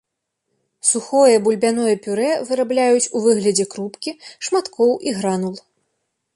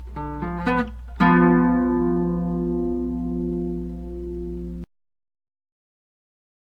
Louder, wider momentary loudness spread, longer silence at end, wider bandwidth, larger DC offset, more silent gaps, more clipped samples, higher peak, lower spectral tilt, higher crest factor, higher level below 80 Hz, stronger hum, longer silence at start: first, -18 LUFS vs -22 LUFS; second, 13 LU vs 16 LU; second, 0.75 s vs 1.95 s; first, 11.5 kHz vs 5.2 kHz; neither; neither; neither; first, -2 dBFS vs -6 dBFS; second, -3.5 dB/octave vs -9.5 dB/octave; about the same, 16 dB vs 18 dB; second, -66 dBFS vs -38 dBFS; neither; first, 0.85 s vs 0 s